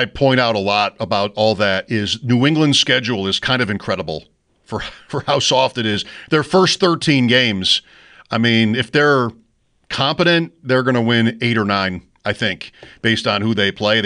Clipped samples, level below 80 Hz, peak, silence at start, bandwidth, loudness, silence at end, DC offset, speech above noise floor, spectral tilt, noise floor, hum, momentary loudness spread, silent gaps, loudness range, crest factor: under 0.1%; -50 dBFS; -2 dBFS; 0 s; 10.5 kHz; -16 LUFS; 0 s; under 0.1%; 43 dB; -4.5 dB/octave; -60 dBFS; none; 11 LU; none; 3 LU; 14 dB